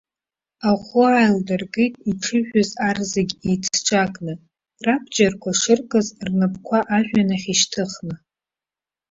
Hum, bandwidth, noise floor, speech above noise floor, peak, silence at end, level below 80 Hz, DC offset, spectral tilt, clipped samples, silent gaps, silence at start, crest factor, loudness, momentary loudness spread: none; 8 kHz; under -90 dBFS; over 70 dB; -2 dBFS; 0.95 s; -56 dBFS; under 0.1%; -4 dB/octave; under 0.1%; none; 0.6 s; 18 dB; -20 LUFS; 9 LU